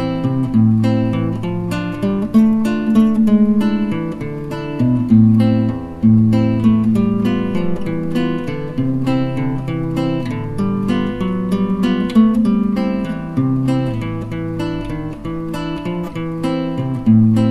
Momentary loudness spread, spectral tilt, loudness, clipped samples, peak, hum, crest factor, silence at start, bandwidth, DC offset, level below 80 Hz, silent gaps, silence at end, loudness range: 11 LU; -8.5 dB/octave; -17 LUFS; under 0.1%; 0 dBFS; none; 16 dB; 0 s; 11 kHz; under 0.1%; -38 dBFS; none; 0 s; 6 LU